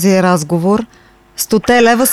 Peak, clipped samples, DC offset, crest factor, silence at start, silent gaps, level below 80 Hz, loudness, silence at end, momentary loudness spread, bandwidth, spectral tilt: 0 dBFS; under 0.1%; under 0.1%; 12 dB; 0 s; none; -44 dBFS; -12 LUFS; 0 s; 15 LU; 16 kHz; -4.5 dB/octave